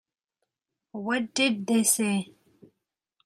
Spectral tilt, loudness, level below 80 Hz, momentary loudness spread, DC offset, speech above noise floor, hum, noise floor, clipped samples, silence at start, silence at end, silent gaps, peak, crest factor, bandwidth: -3 dB/octave; -25 LUFS; -76 dBFS; 17 LU; under 0.1%; 60 dB; none; -86 dBFS; under 0.1%; 0.95 s; 1 s; none; -8 dBFS; 22 dB; 16.5 kHz